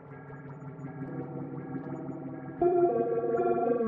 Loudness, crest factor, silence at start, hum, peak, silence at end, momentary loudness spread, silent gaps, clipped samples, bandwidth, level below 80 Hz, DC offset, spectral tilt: -31 LUFS; 16 dB; 0 s; none; -14 dBFS; 0 s; 18 LU; none; under 0.1%; 3.3 kHz; -68 dBFS; under 0.1%; -11.5 dB/octave